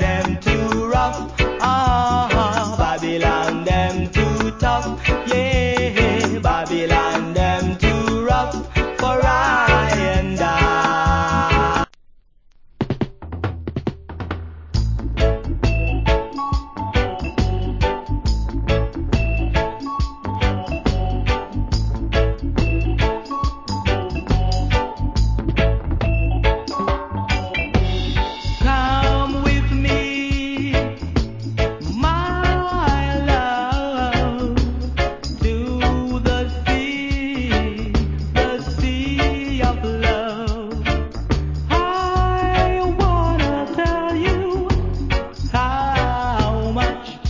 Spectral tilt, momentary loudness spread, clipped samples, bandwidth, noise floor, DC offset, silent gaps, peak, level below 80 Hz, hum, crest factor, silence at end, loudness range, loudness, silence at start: -6 dB/octave; 6 LU; under 0.1%; 7.6 kHz; -49 dBFS; under 0.1%; none; -2 dBFS; -24 dBFS; none; 18 dB; 0 s; 4 LU; -20 LUFS; 0 s